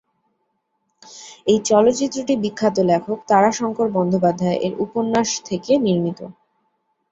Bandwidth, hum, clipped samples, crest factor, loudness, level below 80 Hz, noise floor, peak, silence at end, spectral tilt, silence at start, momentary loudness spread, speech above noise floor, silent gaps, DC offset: 8.2 kHz; none; under 0.1%; 18 dB; -19 LUFS; -60 dBFS; -71 dBFS; -2 dBFS; 0.8 s; -5 dB/octave; 1.1 s; 10 LU; 53 dB; none; under 0.1%